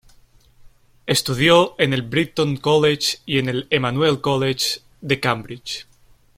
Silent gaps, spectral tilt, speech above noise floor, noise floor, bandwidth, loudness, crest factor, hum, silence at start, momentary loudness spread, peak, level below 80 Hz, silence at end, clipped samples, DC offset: none; -4.5 dB/octave; 32 dB; -52 dBFS; 16.5 kHz; -19 LUFS; 20 dB; none; 0.65 s; 14 LU; -2 dBFS; -52 dBFS; 0.55 s; under 0.1%; under 0.1%